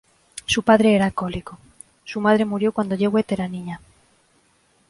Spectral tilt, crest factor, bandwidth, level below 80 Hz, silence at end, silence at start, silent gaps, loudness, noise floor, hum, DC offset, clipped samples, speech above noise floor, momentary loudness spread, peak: -5.5 dB/octave; 20 dB; 11.5 kHz; -50 dBFS; 1.1 s; 0.35 s; none; -20 LUFS; -61 dBFS; none; under 0.1%; under 0.1%; 41 dB; 21 LU; -2 dBFS